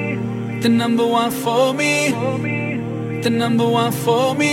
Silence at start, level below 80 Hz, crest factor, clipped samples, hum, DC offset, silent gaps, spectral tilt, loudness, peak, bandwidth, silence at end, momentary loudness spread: 0 s; -58 dBFS; 14 dB; under 0.1%; none; under 0.1%; none; -5 dB/octave; -18 LUFS; -4 dBFS; 16.5 kHz; 0 s; 7 LU